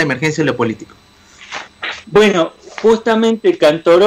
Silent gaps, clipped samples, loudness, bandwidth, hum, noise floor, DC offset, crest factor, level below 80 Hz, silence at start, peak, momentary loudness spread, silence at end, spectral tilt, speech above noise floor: none; under 0.1%; -14 LUFS; 13 kHz; none; -39 dBFS; under 0.1%; 12 dB; -50 dBFS; 0 s; -2 dBFS; 16 LU; 0 s; -5.5 dB/octave; 26 dB